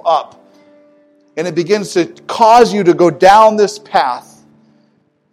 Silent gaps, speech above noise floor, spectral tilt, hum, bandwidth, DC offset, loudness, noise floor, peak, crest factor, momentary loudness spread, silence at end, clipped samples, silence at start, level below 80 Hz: none; 46 dB; -5 dB/octave; none; 14 kHz; under 0.1%; -11 LUFS; -57 dBFS; 0 dBFS; 12 dB; 13 LU; 1.1 s; 1%; 0.05 s; -52 dBFS